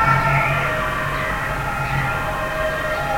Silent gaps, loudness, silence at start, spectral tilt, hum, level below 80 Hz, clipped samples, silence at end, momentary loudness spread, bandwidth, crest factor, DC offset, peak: none; -20 LUFS; 0 s; -5.5 dB/octave; none; -34 dBFS; under 0.1%; 0 s; 6 LU; 16.5 kHz; 16 dB; under 0.1%; -4 dBFS